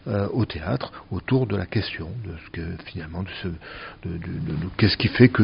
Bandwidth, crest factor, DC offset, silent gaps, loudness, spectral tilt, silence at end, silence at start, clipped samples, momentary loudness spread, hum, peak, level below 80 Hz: 5.4 kHz; 22 dB; under 0.1%; none; -26 LUFS; -5.5 dB/octave; 0 s; 0.05 s; under 0.1%; 14 LU; none; -2 dBFS; -44 dBFS